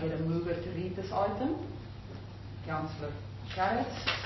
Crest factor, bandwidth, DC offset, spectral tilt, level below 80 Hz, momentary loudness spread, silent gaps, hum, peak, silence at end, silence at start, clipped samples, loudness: 20 dB; 6 kHz; under 0.1%; -6.5 dB/octave; -52 dBFS; 14 LU; none; none; -14 dBFS; 0 s; 0 s; under 0.1%; -35 LUFS